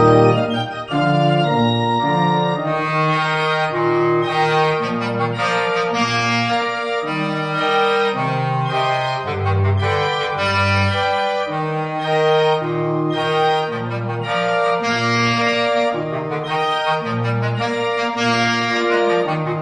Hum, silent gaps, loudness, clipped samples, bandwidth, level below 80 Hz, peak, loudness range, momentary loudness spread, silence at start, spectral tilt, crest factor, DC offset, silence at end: none; none; -18 LUFS; under 0.1%; 10 kHz; -54 dBFS; -2 dBFS; 2 LU; 5 LU; 0 s; -6 dB/octave; 16 dB; under 0.1%; 0 s